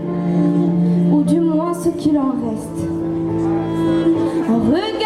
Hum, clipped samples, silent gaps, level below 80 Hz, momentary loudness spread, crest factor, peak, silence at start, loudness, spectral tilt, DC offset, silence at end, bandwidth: none; under 0.1%; none; -46 dBFS; 7 LU; 12 dB; -4 dBFS; 0 s; -17 LUFS; -8 dB/octave; under 0.1%; 0 s; 12.5 kHz